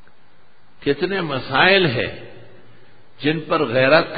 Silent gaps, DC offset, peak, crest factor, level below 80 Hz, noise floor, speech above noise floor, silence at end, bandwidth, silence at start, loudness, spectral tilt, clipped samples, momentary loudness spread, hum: none; 1%; 0 dBFS; 20 dB; -52 dBFS; -55 dBFS; 38 dB; 0 s; 5 kHz; 0.8 s; -18 LUFS; -10.5 dB/octave; under 0.1%; 12 LU; none